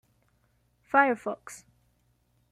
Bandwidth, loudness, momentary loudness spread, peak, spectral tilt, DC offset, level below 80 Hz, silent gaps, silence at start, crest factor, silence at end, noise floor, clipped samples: 14.5 kHz; -26 LUFS; 23 LU; -6 dBFS; -4.5 dB/octave; under 0.1%; -72 dBFS; none; 0.95 s; 24 dB; 0.95 s; -70 dBFS; under 0.1%